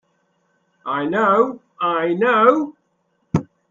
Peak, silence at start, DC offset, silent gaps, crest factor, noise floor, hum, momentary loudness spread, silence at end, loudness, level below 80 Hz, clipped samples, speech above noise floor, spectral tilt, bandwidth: 0 dBFS; 0.85 s; under 0.1%; none; 20 dB; -67 dBFS; none; 11 LU; 0.3 s; -18 LUFS; -62 dBFS; under 0.1%; 50 dB; -7.5 dB/octave; 7.4 kHz